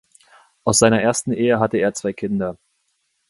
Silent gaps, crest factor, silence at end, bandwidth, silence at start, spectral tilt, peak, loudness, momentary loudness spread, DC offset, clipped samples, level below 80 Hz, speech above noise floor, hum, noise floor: none; 20 dB; 0.75 s; 11.5 kHz; 0.65 s; -4 dB/octave; 0 dBFS; -19 LUFS; 11 LU; under 0.1%; under 0.1%; -52 dBFS; 51 dB; none; -69 dBFS